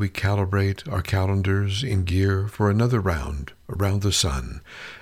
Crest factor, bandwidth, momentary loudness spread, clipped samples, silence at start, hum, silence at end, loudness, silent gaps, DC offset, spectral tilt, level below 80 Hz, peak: 14 dB; 15 kHz; 12 LU; under 0.1%; 0 s; none; 0.05 s; -23 LUFS; none; under 0.1%; -5.5 dB/octave; -38 dBFS; -8 dBFS